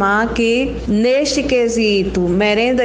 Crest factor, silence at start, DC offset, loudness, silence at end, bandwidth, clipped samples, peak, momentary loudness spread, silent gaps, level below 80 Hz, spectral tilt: 12 dB; 0 s; under 0.1%; -15 LUFS; 0 s; 10 kHz; under 0.1%; -2 dBFS; 3 LU; none; -34 dBFS; -4.5 dB/octave